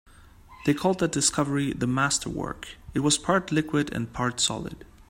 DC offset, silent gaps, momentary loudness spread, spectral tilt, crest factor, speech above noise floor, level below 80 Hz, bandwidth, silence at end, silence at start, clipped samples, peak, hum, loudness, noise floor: under 0.1%; none; 10 LU; -4 dB/octave; 20 dB; 25 dB; -50 dBFS; 16 kHz; 0.25 s; 0.2 s; under 0.1%; -8 dBFS; none; -26 LUFS; -50 dBFS